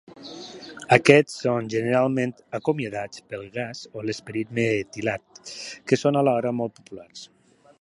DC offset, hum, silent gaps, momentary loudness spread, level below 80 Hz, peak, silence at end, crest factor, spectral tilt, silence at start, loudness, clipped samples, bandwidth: under 0.1%; none; none; 21 LU; -64 dBFS; 0 dBFS; 0.55 s; 24 dB; -5.5 dB/octave; 0.2 s; -23 LUFS; under 0.1%; 11.5 kHz